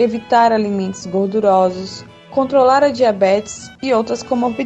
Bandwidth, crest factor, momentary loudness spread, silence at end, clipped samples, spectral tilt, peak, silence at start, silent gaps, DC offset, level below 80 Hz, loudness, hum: 8.6 kHz; 14 dB; 12 LU; 0 s; under 0.1%; -5.5 dB/octave; -2 dBFS; 0 s; none; under 0.1%; -54 dBFS; -15 LUFS; none